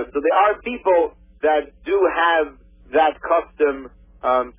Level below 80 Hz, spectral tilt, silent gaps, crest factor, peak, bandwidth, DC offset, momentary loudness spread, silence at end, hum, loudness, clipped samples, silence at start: -50 dBFS; -7.5 dB/octave; none; 14 dB; -6 dBFS; 3.7 kHz; under 0.1%; 7 LU; 0.1 s; none; -20 LUFS; under 0.1%; 0 s